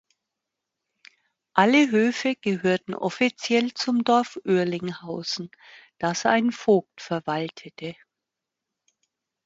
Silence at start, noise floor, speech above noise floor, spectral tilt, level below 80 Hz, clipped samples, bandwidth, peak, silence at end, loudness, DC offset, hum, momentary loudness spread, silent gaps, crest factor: 1.55 s; -86 dBFS; 62 dB; -5 dB/octave; -68 dBFS; under 0.1%; 8 kHz; -2 dBFS; 1.5 s; -24 LUFS; under 0.1%; none; 13 LU; none; 24 dB